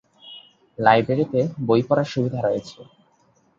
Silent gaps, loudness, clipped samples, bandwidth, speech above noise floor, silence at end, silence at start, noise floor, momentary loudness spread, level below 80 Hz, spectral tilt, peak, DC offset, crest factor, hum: none; -21 LUFS; under 0.1%; 7.6 kHz; 41 dB; 0.75 s; 0.25 s; -61 dBFS; 24 LU; -60 dBFS; -7.5 dB/octave; -2 dBFS; under 0.1%; 22 dB; none